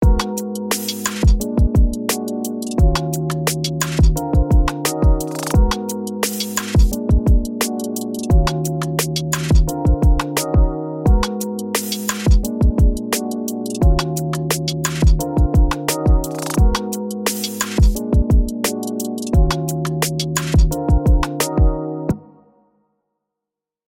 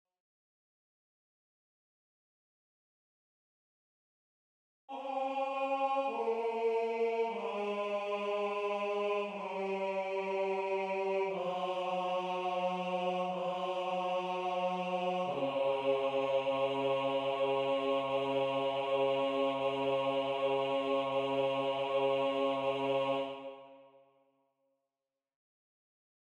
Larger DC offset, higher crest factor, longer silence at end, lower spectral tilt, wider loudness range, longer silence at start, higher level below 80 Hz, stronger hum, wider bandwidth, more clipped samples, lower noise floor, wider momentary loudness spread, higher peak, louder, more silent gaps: neither; about the same, 14 dB vs 14 dB; second, 1.75 s vs 2.4 s; about the same, -5 dB/octave vs -5.5 dB/octave; second, 1 LU vs 5 LU; second, 0 s vs 4.9 s; first, -20 dBFS vs -80 dBFS; neither; first, 17 kHz vs 9.6 kHz; neither; second, -85 dBFS vs under -90 dBFS; about the same, 6 LU vs 4 LU; first, -2 dBFS vs -20 dBFS; first, -19 LUFS vs -34 LUFS; neither